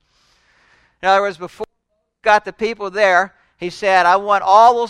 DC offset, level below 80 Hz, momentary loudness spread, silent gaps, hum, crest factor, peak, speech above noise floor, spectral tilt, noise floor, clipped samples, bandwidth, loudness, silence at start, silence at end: under 0.1%; -56 dBFS; 17 LU; none; none; 16 dB; 0 dBFS; 56 dB; -3.5 dB/octave; -70 dBFS; under 0.1%; 11 kHz; -15 LUFS; 1.05 s; 0 s